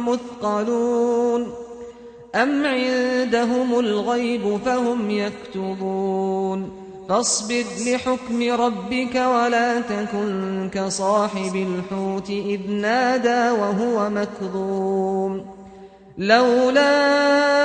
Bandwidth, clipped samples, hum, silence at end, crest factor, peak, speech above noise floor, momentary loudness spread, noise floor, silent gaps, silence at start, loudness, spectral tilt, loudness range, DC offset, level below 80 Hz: 9.4 kHz; under 0.1%; none; 0 s; 18 dB; -4 dBFS; 23 dB; 10 LU; -43 dBFS; none; 0 s; -21 LUFS; -4 dB/octave; 3 LU; under 0.1%; -58 dBFS